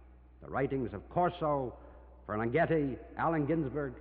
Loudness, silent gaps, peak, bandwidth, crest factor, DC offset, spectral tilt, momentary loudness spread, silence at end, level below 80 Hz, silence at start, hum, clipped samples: -33 LUFS; none; -18 dBFS; 4.7 kHz; 16 dB; under 0.1%; -7 dB/octave; 11 LU; 0 s; -54 dBFS; 0 s; none; under 0.1%